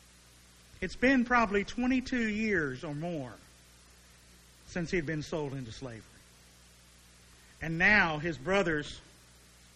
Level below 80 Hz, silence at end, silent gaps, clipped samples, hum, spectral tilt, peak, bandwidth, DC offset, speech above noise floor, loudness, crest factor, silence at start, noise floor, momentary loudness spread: -52 dBFS; 0.75 s; none; under 0.1%; 60 Hz at -60 dBFS; -5.5 dB/octave; -12 dBFS; 13 kHz; under 0.1%; 28 dB; -30 LUFS; 22 dB; 0.8 s; -58 dBFS; 18 LU